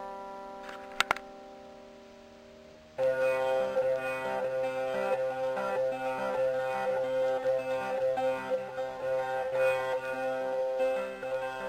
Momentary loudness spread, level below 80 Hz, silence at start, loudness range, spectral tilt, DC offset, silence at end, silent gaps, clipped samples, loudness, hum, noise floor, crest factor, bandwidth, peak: 15 LU; -66 dBFS; 0 s; 2 LU; -4 dB/octave; under 0.1%; 0 s; none; under 0.1%; -31 LUFS; none; -52 dBFS; 30 dB; 15.5 kHz; -2 dBFS